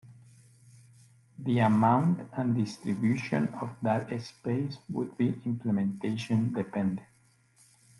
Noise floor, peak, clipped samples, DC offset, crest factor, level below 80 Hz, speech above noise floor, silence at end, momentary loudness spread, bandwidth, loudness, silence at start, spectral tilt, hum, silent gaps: -64 dBFS; -12 dBFS; under 0.1%; under 0.1%; 18 dB; -70 dBFS; 35 dB; 0.95 s; 11 LU; 11.5 kHz; -30 LUFS; 0.05 s; -8 dB/octave; none; none